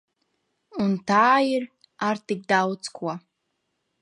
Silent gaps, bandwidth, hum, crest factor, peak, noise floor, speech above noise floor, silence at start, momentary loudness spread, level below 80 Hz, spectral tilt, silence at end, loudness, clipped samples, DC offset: none; 11 kHz; none; 18 dB; -6 dBFS; -77 dBFS; 54 dB; 0.75 s; 16 LU; -70 dBFS; -5 dB/octave; 0.85 s; -23 LUFS; under 0.1%; under 0.1%